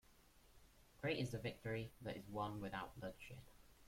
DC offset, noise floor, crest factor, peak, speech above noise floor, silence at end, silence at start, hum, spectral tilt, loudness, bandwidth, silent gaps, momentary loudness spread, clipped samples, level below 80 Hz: under 0.1%; -69 dBFS; 20 dB; -30 dBFS; 22 dB; 0 s; 0.1 s; none; -6 dB/octave; -48 LUFS; 16.5 kHz; none; 11 LU; under 0.1%; -68 dBFS